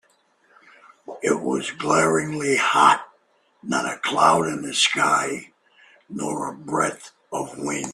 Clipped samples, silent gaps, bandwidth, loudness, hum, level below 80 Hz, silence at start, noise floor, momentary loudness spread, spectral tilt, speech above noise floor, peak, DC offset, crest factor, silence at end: under 0.1%; none; 14 kHz; -21 LUFS; none; -66 dBFS; 1.1 s; -62 dBFS; 14 LU; -3 dB/octave; 41 dB; -2 dBFS; under 0.1%; 22 dB; 0 s